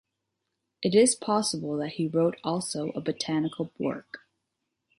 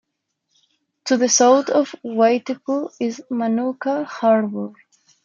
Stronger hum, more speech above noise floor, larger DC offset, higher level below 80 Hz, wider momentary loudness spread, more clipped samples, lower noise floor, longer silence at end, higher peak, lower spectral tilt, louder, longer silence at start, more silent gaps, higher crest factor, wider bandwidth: neither; about the same, 55 dB vs 56 dB; neither; about the same, -70 dBFS vs -74 dBFS; about the same, 11 LU vs 12 LU; neither; first, -82 dBFS vs -75 dBFS; first, 0.8 s vs 0.55 s; second, -10 dBFS vs -4 dBFS; first, -4.5 dB/octave vs -3 dB/octave; second, -27 LUFS vs -19 LUFS; second, 0.8 s vs 1.05 s; neither; about the same, 20 dB vs 18 dB; first, 11.5 kHz vs 7.6 kHz